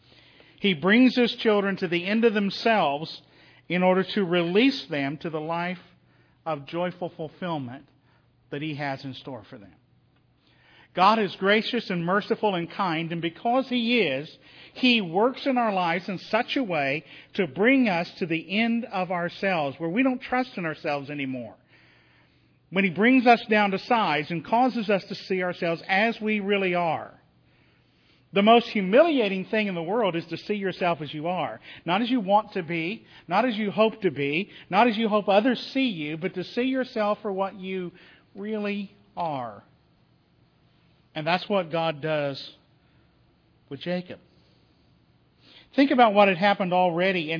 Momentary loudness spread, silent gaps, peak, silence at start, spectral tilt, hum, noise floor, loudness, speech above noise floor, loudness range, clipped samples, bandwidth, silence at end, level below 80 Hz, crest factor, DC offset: 14 LU; none; -4 dBFS; 0.6 s; -7 dB/octave; none; -63 dBFS; -24 LUFS; 39 dB; 10 LU; under 0.1%; 5.4 kHz; 0 s; -72 dBFS; 20 dB; under 0.1%